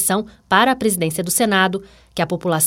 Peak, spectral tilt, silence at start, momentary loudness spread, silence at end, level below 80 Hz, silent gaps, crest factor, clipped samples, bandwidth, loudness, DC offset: -2 dBFS; -3.5 dB/octave; 0 s; 9 LU; 0 s; -52 dBFS; none; 18 dB; under 0.1%; 17 kHz; -18 LUFS; under 0.1%